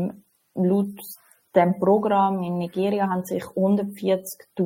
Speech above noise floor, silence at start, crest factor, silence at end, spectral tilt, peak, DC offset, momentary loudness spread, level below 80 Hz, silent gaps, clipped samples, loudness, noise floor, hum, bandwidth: 20 dB; 0 s; 18 dB; 0 s; -7.5 dB/octave; -4 dBFS; under 0.1%; 15 LU; -68 dBFS; none; under 0.1%; -23 LUFS; -42 dBFS; none; 16.5 kHz